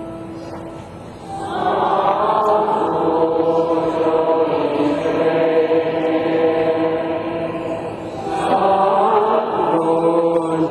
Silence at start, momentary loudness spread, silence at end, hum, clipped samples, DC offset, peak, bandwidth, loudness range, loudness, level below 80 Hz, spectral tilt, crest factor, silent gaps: 0 s; 15 LU; 0 s; none; under 0.1%; under 0.1%; -4 dBFS; 10.5 kHz; 2 LU; -17 LUFS; -50 dBFS; -7 dB/octave; 12 dB; none